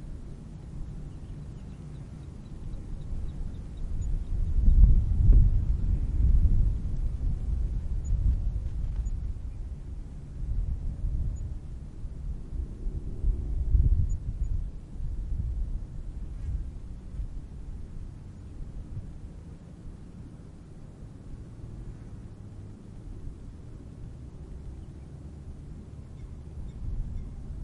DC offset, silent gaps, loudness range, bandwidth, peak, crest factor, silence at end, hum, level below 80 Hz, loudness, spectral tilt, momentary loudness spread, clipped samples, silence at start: under 0.1%; none; 18 LU; 7.4 kHz; -6 dBFS; 22 dB; 0 s; none; -30 dBFS; -33 LUFS; -9 dB/octave; 19 LU; under 0.1%; 0 s